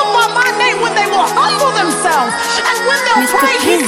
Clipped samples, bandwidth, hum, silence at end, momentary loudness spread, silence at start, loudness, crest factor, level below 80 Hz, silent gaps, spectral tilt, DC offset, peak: under 0.1%; 16.5 kHz; none; 0 s; 2 LU; 0 s; -12 LUFS; 12 dB; -52 dBFS; none; -2 dB/octave; under 0.1%; 0 dBFS